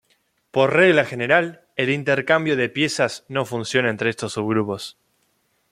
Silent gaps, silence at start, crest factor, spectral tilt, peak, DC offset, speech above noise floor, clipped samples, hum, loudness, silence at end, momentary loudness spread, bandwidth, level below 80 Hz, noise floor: none; 0.55 s; 20 dB; -5 dB/octave; -2 dBFS; under 0.1%; 47 dB; under 0.1%; none; -20 LUFS; 0.8 s; 11 LU; 15 kHz; -64 dBFS; -67 dBFS